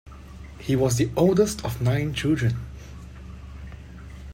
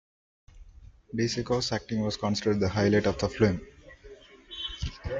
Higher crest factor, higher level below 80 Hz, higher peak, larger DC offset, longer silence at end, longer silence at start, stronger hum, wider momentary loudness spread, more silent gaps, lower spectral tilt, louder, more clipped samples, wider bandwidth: about the same, 18 dB vs 20 dB; first, -42 dBFS vs -48 dBFS; about the same, -8 dBFS vs -10 dBFS; neither; about the same, 0 s vs 0 s; second, 0.05 s vs 0.55 s; neither; first, 22 LU vs 12 LU; neither; about the same, -6 dB/octave vs -5.5 dB/octave; first, -23 LUFS vs -28 LUFS; neither; first, 16 kHz vs 7.8 kHz